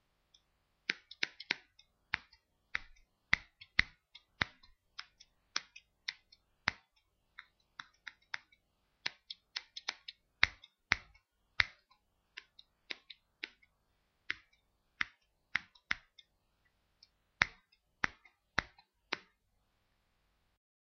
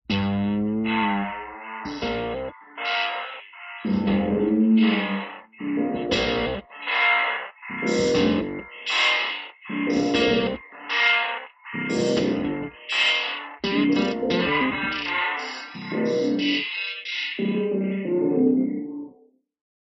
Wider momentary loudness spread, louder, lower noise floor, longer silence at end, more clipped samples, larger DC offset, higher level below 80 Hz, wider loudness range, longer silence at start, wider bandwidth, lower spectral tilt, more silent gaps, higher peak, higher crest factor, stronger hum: first, 21 LU vs 13 LU; second, -39 LUFS vs -23 LUFS; first, -78 dBFS vs -57 dBFS; first, 1.8 s vs 0.9 s; neither; neither; second, -64 dBFS vs -52 dBFS; first, 8 LU vs 3 LU; first, 0.9 s vs 0.1 s; second, 7 kHz vs 8.2 kHz; second, 0.5 dB/octave vs -5 dB/octave; neither; first, -4 dBFS vs -8 dBFS; first, 38 dB vs 16 dB; neither